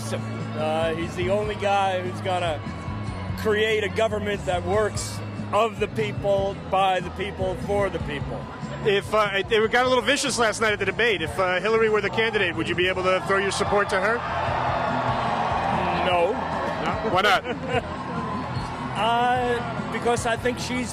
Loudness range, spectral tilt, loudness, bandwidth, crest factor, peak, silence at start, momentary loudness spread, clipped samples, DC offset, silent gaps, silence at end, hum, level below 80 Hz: 4 LU; -4.5 dB/octave; -24 LUFS; 15.5 kHz; 16 dB; -8 dBFS; 0 s; 9 LU; under 0.1%; under 0.1%; none; 0 s; none; -44 dBFS